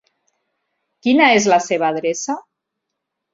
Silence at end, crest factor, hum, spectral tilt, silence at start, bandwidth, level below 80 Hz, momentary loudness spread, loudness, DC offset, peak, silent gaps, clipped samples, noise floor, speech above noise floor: 0.95 s; 18 dB; none; -3 dB/octave; 1.05 s; 7.8 kHz; -64 dBFS; 13 LU; -16 LUFS; under 0.1%; 0 dBFS; none; under 0.1%; -79 dBFS; 63 dB